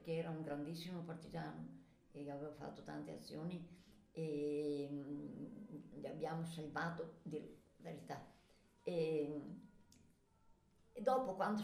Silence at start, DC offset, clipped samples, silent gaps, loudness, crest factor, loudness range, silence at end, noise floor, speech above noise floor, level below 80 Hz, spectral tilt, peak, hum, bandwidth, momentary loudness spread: 0 s; under 0.1%; under 0.1%; none; -46 LUFS; 22 dB; 5 LU; 0 s; -72 dBFS; 27 dB; -76 dBFS; -7 dB/octave; -24 dBFS; none; 15.5 kHz; 16 LU